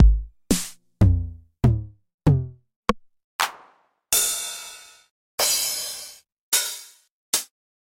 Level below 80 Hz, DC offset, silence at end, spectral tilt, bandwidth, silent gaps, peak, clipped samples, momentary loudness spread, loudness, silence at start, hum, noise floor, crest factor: -30 dBFS; under 0.1%; 0.4 s; -3.5 dB/octave; 17 kHz; 2.14-2.18 s, 2.76-2.83 s, 3.24-3.39 s, 5.10-5.38 s, 6.32-6.52 s, 7.11-7.33 s; 0 dBFS; under 0.1%; 17 LU; -23 LUFS; 0 s; none; -58 dBFS; 22 dB